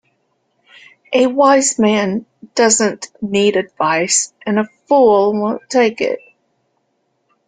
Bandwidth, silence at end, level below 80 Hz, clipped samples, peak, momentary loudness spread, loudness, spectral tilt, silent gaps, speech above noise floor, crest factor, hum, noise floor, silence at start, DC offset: 9.6 kHz; 1.3 s; -60 dBFS; under 0.1%; 0 dBFS; 10 LU; -15 LUFS; -3 dB/octave; none; 52 dB; 16 dB; none; -66 dBFS; 1.1 s; under 0.1%